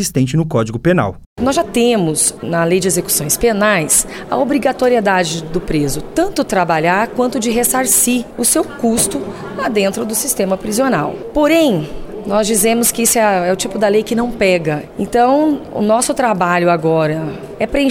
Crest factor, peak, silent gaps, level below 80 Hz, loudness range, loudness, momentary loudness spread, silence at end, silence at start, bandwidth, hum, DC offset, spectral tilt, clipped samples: 14 dB; -2 dBFS; 1.26-1.36 s; -38 dBFS; 2 LU; -14 LUFS; 7 LU; 0 s; 0 s; 17.5 kHz; none; under 0.1%; -4 dB/octave; under 0.1%